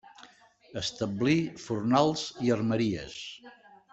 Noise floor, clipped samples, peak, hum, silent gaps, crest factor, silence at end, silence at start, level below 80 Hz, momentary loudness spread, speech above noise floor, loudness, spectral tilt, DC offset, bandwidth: -57 dBFS; under 0.1%; -10 dBFS; none; none; 20 dB; 0.4 s; 0.2 s; -62 dBFS; 16 LU; 28 dB; -29 LUFS; -5.5 dB/octave; under 0.1%; 8.2 kHz